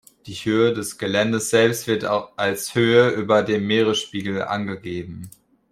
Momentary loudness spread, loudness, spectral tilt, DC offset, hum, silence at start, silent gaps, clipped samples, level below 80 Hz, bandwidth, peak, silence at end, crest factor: 13 LU; -21 LUFS; -4.5 dB/octave; under 0.1%; none; 0.25 s; none; under 0.1%; -60 dBFS; 16 kHz; -2 dBFS; 0.4 s; 18 dB